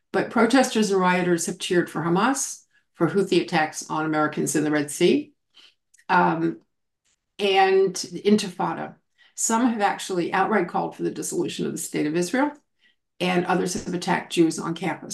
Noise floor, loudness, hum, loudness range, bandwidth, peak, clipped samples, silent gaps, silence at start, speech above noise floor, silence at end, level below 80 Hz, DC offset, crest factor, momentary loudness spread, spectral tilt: -72 dBFS; -23 LUFS; none; 3 LU; 12.5 kHz; -6 dBFS; under 0.1%; none; 0.15 s; 49 dB; 0 s; -66 dBFS; under 0.1%; 18 dB; 8 LU; -4.5 dB/octave